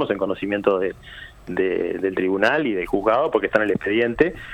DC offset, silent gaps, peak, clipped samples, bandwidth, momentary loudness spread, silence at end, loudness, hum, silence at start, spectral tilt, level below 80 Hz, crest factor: under 0.1%; none; -2 dBFS; under 0.1%; 12 kHz; 9 LU; 0 s; -21 LUFS; none; 0 s; -6.5 dB/octave; -48 dBFS; 20 dB